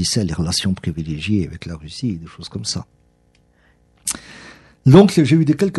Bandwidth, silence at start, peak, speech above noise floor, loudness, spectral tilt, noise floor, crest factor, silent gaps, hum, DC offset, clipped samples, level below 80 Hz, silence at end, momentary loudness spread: 12 kHz; 0 s; 0 dBFS; 41 dB; -18 LUFS; -5.5 dB/octave; -57 dBFS; 18 dB; none; none; under 0.1%; under 0.1%; -42 dBFS; 0 s; 19 LU